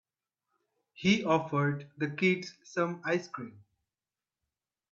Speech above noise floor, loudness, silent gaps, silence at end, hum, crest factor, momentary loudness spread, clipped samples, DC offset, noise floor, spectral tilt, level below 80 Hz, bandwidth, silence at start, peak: over 59 dB; -31 LUFS; none; 1.35 s; none; 22 dB; 12 LU; under 0.1%; under 0.1%; under -90 dBFS; -6 dB/octave; -72 dBFS; 7.4 kHz; 1 s; -12 dBFS